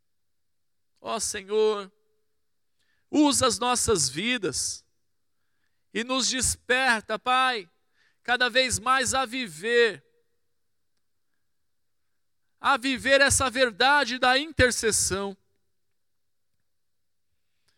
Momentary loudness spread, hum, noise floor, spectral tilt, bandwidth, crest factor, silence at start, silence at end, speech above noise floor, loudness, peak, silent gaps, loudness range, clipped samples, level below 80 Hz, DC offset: 11 LU; none; -84 dBFS; -2 dB/octave; 17.5 kHz; 20 dB; 1.05 s; 2.45 s; 60 dB; -24 LUFS; -8 dBFS; none; 7 LU; under 0.1%; -52 dBFS; under 0.1%